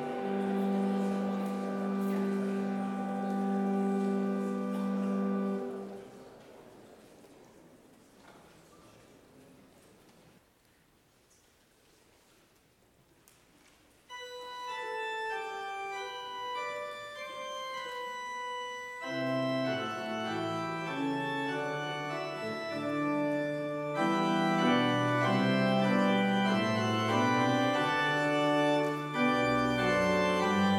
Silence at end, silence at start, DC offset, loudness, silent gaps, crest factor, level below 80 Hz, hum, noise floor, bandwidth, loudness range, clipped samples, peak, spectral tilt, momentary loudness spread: 0 s; 0 s; under 0.1%; -31 LUFS; none; 18 dB; -68 dBFS; none; -66 dBFS; 15 kHz; 12 LU; under 0.1%; -16 dBFS; -6 dB/octave; 12 LU